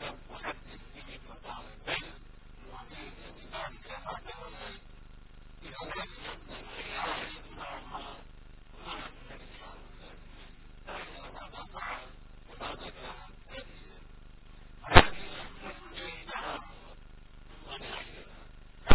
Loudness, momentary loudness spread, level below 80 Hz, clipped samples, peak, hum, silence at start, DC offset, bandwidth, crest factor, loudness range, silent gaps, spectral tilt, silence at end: -35 LUFS; 19 LU; -44 dBFS; under 0.1%; 0 dBFS; none; 0 s; under 0.1%; 4 kHz; 34 dB; 16 LU; none; -3 dB/octave; 0 s